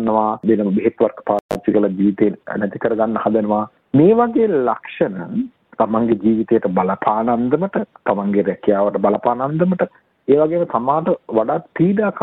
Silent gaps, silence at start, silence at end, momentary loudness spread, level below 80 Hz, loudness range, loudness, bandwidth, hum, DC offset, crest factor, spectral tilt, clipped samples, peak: 1.41-1.49 s; 0 s; 0 s; 6 LU; -56 dBFS; 2 LU; -18 LUFS; 5.6 kHz; none; under 0.1%; 16 dB; -9.5 dB/octave; under 0.1%; -2 dBFS